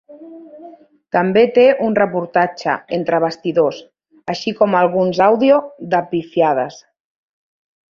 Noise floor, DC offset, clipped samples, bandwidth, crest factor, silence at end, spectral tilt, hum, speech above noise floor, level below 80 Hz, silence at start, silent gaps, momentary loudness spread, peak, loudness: -41 dBFS; under 0.1%; under 0.1%; 7.2 kHz; 16 dB; 1.1 s; -6.5 dB/octave; none; 26 dB; -60 dBFS; 0.1 s; none; 10 LU; 0 dBFS; -16 LUFS